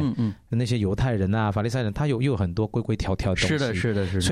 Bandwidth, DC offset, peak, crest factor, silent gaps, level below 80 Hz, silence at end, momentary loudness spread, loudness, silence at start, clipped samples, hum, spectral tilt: 13 kHz; under 0.1%; -12 dBFS; 12 dB; none; -42 dBFS; 0 s; 3 LU; -25 LUFS; 0 s; under 0.1%; none; -6 dB/octave